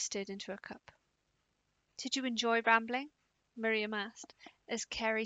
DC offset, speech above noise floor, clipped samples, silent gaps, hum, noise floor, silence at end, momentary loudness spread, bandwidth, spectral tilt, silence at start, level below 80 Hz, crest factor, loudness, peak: under 0.1%; 44 dB; under 0.1%; none; none; -80 dBFS; 0 s; 22 LU; 9.4 kHz; -2 dB/octave; 0 s; -72 dBFS; 24 dB; -35 LUFS; -12 dBFS